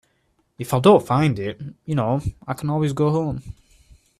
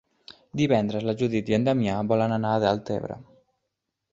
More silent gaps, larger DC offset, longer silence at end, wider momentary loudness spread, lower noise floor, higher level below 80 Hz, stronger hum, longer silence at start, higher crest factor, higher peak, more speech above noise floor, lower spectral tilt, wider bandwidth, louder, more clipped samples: neither; neither; second, 0.7 s vs 0.9 s; first, 15 LU vs 9 LU; second, -66 dBFS vs -81 dBFS; first, -46 dBFS vs -56 dBFS; neither; first, 0.6 s vs 0.3 s; about the same, 20 dB vs 20 dB; first, -2 dBFS vs -6 dBFS; second, 46 dB vs 57 dB; about the same, -7.5 dB/octave vs -7.5 dB/octave; first, 14.5 kHz vs 7.8 kHz; first, -21 LUFS vs -25 LUFS; neither